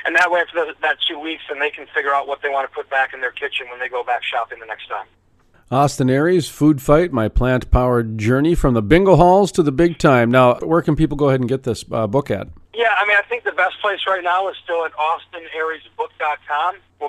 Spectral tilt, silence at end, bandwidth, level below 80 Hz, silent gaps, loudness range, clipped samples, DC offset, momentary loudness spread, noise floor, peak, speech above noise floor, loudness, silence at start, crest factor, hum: -6 dB/octave; 0 s; 14 kHz; -32 dBFS; none; 7 LU; under 0.1%; under 0.1%; 11 LU; -54 dBFS; 0 dBFS; 37 dB; -18 LUFS; 0 s; 18 dB; none